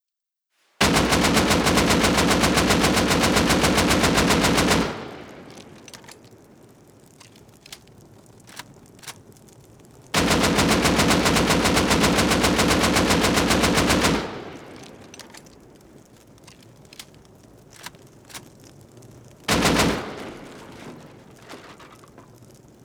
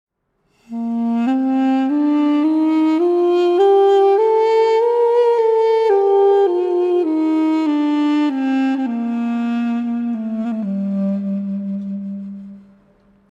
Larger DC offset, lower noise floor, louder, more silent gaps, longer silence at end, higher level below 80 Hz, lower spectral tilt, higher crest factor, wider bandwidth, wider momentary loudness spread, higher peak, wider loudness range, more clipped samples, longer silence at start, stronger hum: neither; first, -86 dBFS vs -65 dBFS; second, -19 LUFS vs -16 LUFS; neither; first, 1 s vs 0.7 s; first, -38 dBFS vs -66 dBFS; second, -3.5 dB/octave vs -8 dB/octave; first, 20 dB vs 12 dB; first, over 20 kHz vs 8 kHz; first, 23 LU vs 10 LU; about the same, -4 dBFS vs -6 dBFS; about the same, 10 LU vs 8 LU; neither; about the same, 0.8 s vs 0.7 s; neither